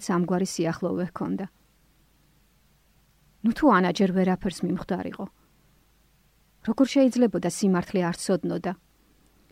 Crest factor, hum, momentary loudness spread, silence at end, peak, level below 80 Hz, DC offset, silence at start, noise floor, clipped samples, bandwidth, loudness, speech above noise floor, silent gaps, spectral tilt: 18 dB; none; 14 LU; 0.8 s; -8 dBFS; -56 dBFS; under 0.1%; 0 s; -63 dBFS; under 0.1%; 15.5 kHz; -25 LUFS; 38 dB; none; -6 dB/octave